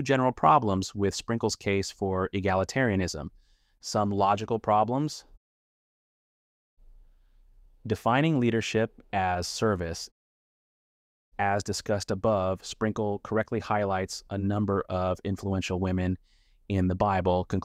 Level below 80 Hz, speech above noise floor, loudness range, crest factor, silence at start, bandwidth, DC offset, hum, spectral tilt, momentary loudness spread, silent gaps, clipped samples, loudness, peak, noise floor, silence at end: -54 dBFS; 31 dB; 4 LU; 22 dB; 0 s; 15 kHz; under 0.1%; none; -5.5 dB/octave; 8 LU; 5.37-6.77 s, 10.12-11.32 s; under 0.1%; -28 LUFS; -6 dBFS; -58 dBFS; 0 s